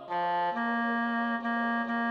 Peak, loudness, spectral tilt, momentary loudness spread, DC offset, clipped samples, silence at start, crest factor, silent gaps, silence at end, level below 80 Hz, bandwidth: -20 dBFS; -30 LUFS; -6.5 dB/octave; 1 LU; under 0.1%; under 0.1%; 0 s; 10 dB; none; 0 s; -84 dBFS; 5.6 kHz